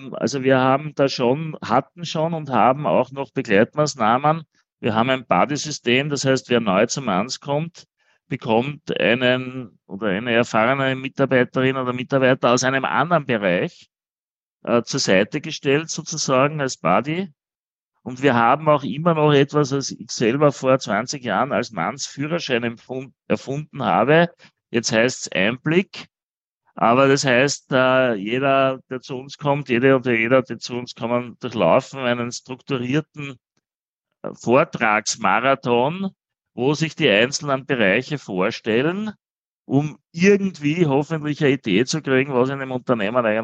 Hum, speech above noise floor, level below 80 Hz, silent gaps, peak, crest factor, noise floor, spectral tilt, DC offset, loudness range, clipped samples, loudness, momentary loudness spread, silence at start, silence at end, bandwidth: none; over 70 dB; -66 dBFS; 4.73-4.77 s, 14.13-14.60 s, 17.59-17.68 s, 17.87-17.92 s, 26.23-26.61 s, 33.75-33.97 s, 39.30-39.60 s; -2 dBFS; 18 dB; under -90 dBFS; -5 dB/octave; under 0.1%; 3 LU; under 0.1%; -20 LUFS; 11 LU; 0 s; 0 s; 8.8 kHz